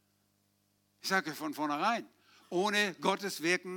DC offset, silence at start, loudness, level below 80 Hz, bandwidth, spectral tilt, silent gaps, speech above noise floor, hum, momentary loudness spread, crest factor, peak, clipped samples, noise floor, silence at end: under 0.1%; 1.05 s; -33 LUFS; under -90 dBFS; 19.5 kHz; -3.5 dB/octave; none; 42 dB; 50 Hz at -65 dBFS; 8 LU; 22 dB; -14 dBFS; under 0.1%; -75 dBFS; 0 s